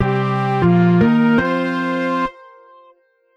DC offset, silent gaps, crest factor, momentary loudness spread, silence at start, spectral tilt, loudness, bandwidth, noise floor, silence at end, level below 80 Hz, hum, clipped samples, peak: under 0.1%; none; 14 dB; 7 LU; 0 s; -8.5 dB/octave; -16 LUFS; 6.6 kHz; -54 dBFS; 1.05 s; -44 dBFS; none; under 0.1%; -4 dBFS